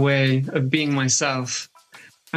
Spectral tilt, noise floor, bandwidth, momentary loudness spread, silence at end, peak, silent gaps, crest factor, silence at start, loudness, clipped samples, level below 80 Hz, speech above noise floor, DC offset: -4 dB/octave; -49 dBFS; 11.5 kHz; 9 LU; 0 s; -6 dBFS; none; 16 dB; 0 s; -21 LUFS; under 0.1%; -66 dBFS; 28 dB; under 0.1%